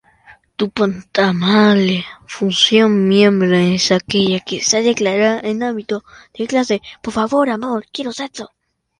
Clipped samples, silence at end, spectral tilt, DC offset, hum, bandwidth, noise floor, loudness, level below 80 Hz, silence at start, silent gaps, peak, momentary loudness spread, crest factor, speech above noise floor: under 0.1%; 0.55 s; -4.5 dB/octave; under 0.1%; none; 11 kHz; -48 dBFS; -15 LUFS; -54 dBFS; 0.3 s; none; 0 dBFS; 13 LU; 16 dB; 32 dB